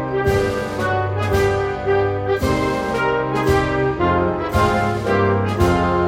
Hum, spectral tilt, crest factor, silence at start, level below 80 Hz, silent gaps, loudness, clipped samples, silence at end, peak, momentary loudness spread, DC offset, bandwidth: none; -6.5 dB/octave; 16 dB; 0 s; -32 dBFS; none; -19 LUFS; under 0.1%; 0 s; -2 dBFS; 3 LU; under 0.1%; 16.5 kHz